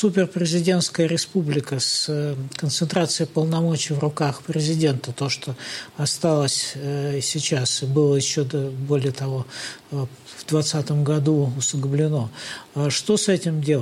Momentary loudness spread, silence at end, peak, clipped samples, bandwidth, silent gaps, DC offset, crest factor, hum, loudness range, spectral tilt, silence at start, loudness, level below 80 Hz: 10 LU; 0 s; -6 dBFS; under 0.1%; 15 kHz; none; under 0.1%; 16 dB; none; 2 LU; -5 dB/octave; 0 s; -22 LUFS; -64 dBFS